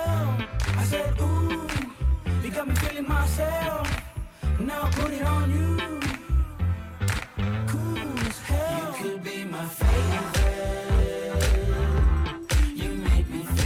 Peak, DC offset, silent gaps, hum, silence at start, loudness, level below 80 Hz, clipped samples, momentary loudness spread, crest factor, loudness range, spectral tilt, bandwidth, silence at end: -10 dBFS; under 0.1%; none; none; 0 s; -27 LUFS; -28 dBFS; under 0.1%; 6 LU; 14 dB; 3 LU; -5.5 dB/octave; 16.5 kHz; 0 s